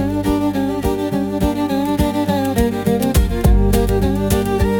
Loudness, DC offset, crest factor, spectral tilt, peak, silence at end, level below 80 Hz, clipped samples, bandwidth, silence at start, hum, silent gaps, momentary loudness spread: -17 LUFS; under 0.1%; 14 dB; -6.5 dB/octave; -2 dBFS; 0 s; -22 dBFS; under 0.1%; 18 kHz; 0 s; none; none; 4 LU